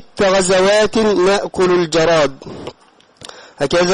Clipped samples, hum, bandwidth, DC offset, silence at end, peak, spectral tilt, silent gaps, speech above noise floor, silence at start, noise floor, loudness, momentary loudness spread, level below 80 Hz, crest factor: under 0.1%; none; 11.5 kHz; under 0.1%; 0 s; -6 dBFS; -4 dB/octave; none; 36 dB; 0 s; -49 dBFS; -14 LUFS; 20 LU; -44 dBFS; 10 dB